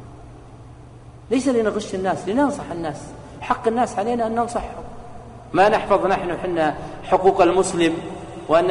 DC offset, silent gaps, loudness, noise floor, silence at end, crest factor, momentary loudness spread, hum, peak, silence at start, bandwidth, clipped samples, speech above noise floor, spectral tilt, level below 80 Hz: under 0.1%; none; -20 LUFS; -42 dBFS; 0 s; 18 dB; 18 LU; none; -2 dBFS; 0 s; 11 kHz; under 0.1%; 22 dB; -5 dB/octave; -44 dBFS